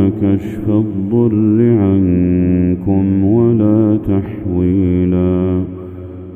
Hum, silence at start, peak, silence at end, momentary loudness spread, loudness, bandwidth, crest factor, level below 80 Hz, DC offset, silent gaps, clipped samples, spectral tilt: none; 0 s; 0 dBFS; 0 s; 7 LU; -14 LUFS; 3.6 kHz; 12 dB; -38 dBFS; under 0.1%; none; under 0.1%; -12 dB/octave